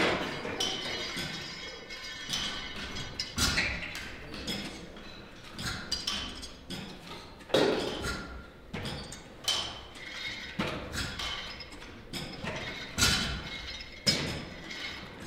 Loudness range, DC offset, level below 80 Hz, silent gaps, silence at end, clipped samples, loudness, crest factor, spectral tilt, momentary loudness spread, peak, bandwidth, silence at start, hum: 5 LU; under 0.1%; -48 dBFS; none; 0 s; under 0.1%; -33 LUFS; 24 dB; -2.5 dB/octave; 16 LU; -12 dBFS; 16.5 kHz; 0 s; none